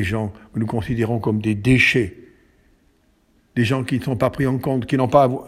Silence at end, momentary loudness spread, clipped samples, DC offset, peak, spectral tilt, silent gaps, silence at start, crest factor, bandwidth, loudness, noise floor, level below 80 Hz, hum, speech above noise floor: 0 s; 11 LU; under 0.1%; under 0.1%; 0 dBFS; -6.5 dB/octave; none; 0 s; 20 dB; 15 kHz; -20 LUFS; -60 dBFS; -44 dBFS; none; 40 dB